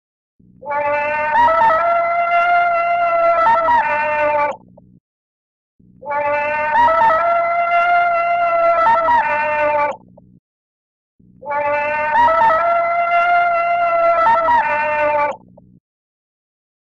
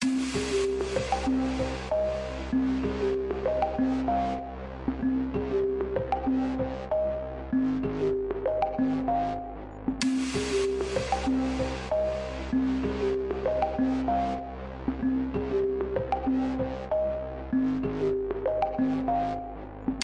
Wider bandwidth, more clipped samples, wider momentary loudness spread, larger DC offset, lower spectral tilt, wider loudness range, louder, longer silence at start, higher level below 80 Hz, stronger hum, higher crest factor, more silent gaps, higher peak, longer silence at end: second, 7 kHz vs 11 kHz; neither; about the same, 8 LU vs 6 LU; neither; about the same, -5 dB/octave vs -6 dB/octave; first, 4 LU vs 1 LU; first, -15 LUFS vs -29 LUFS; first, 0.65 s vs 0 s; second, -52 dBFS vs -42 dBFS; neither; about the same, 12 dB vs 16 dB; first, 5.00-5.79 s, 10.39-11.19 s vs none; first, -4 dBFS vs -14 dBFS; first, 1.6 s vs 0 s